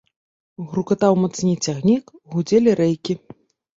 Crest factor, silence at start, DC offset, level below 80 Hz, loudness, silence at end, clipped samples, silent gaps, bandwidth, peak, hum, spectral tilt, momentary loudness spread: 18 dB; 0.6 s; under 0.1%; -60 dBFS; -20 LUFS; 0.6 s; under 0.1%; none; 7.8 kHz; -2 dBFS; none; -6.5 dB/octave; 11 LU